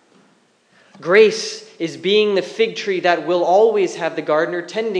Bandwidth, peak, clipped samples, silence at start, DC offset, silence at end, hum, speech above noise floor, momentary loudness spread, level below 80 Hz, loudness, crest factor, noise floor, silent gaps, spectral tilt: 10 kHz; 0 dBFS; under 0.1%; 1 s; under 0.1%; 0 s; none; 40 dB; 12 LU; -82 dBFS; -17 LUFS; 18 dB; -57 dBFS; none; -4 dB/octave